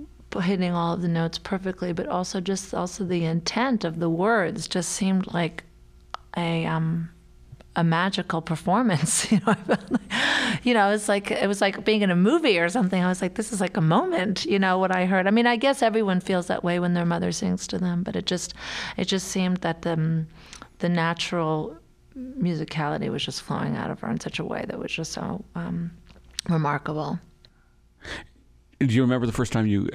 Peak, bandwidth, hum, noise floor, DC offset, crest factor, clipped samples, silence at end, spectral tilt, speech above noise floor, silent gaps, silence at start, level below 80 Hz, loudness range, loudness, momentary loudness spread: -6 dBFS; 14 kHz; none; -58 dBFS; under 0.1%; 18 dB; under 0.1%; 0 s; -5 dB/octave; 34 dB; none; 0 s; -52 dBFS; 7 LU; -25 LUFS; 11 LU